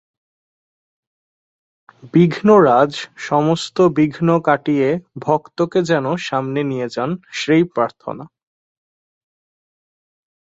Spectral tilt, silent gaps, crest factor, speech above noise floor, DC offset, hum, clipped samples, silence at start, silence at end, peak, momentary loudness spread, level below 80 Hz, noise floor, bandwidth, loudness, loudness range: -6.5 dB/octave; none; 18 dB; over 74 dB; under 0.1%; none; under 0.1%; 2.05 s; 2.2 s; -2 dBFS; 11 LU; -60 dBFS; under -90 dBFS; 8.2 kHz; -17 LUFS; 7 LU